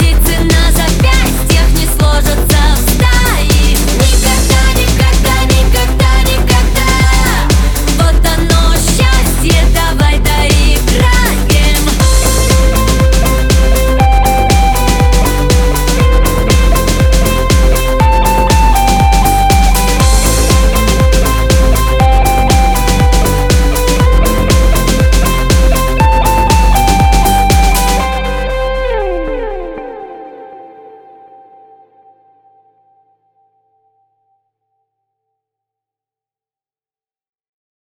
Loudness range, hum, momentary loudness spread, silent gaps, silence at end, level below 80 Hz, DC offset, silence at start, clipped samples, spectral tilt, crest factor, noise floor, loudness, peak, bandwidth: 2 LU; none; 3 LU; none; 7.35 s; -12 dBFS; under 0.1%; 0 s; under 0.1%; -4.5 dB/octave; 10 dB; under -90 dBFS; -10 LUFS; 0 dBFS; 19.5 kHz